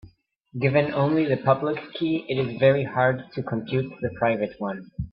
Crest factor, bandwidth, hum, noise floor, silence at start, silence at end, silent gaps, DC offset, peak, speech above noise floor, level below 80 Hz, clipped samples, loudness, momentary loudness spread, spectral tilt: 20 dB; 5.4 kHz; none; -54 dBFS; 0.05 s; 0.05 s; none; under 0.1%; -4 dBFS; 30 dB; -54 dBFS; under 0.1%; -24 LUFS; 10 LU; -11 dB/octave